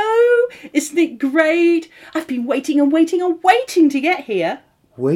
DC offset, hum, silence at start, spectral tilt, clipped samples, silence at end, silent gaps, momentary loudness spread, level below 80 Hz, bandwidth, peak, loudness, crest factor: under 0.1%; none; 0 s; -5 dB/octave; under 0.1%; 0 s; none; 10 LU; -68 dBFS; 15 kHz; 0 dBFS; -17 LUFS; 16 dB